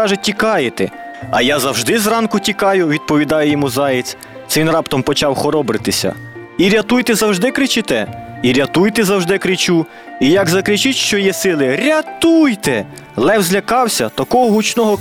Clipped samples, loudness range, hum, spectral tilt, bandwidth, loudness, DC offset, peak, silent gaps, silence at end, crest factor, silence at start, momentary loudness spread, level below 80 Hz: under 0.1%; 2 LU; none; -4 dB/octave; 18.5 kHz; -14 LUFS; 0.2%; -2 dBFS; none; 0 s; 12 dB; 0 s; 6 LU; -48 dBFS